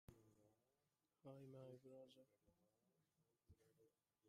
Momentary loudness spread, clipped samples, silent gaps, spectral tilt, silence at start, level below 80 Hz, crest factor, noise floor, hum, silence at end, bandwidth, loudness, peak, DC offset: 7 LU; under 0.1%; none; -7 dB/octave; 0.1 s; -88 dBFS; 20 dB; under -90 dBFS; none; 0 s; 11.5 kHz; -64 LUFS; -48 dBFS; under 0.1%